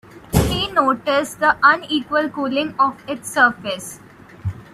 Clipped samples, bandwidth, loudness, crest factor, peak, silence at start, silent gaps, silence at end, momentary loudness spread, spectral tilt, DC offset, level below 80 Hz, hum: under 0.1%; 15.5 kHz; -18 LUFS; 18 dB; 0 dBFS; 0.15 s; none; 0.1 s; 14 LU; -4.5 dB/octave; under 0.1%; -38 dBFS; none